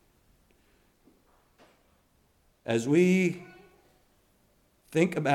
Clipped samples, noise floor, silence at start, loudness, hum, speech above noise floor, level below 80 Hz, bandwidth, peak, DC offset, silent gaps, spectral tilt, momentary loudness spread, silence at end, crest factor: under 0.1%; -67 dBFS; 2.65 s; -26 LUFS; none; 42 dB; -70 dBFS; 13.5 kHz; -10 dBFS; under 0.1%; none; -6.5 dB/octave; 20 LU; 0 s; 20 dB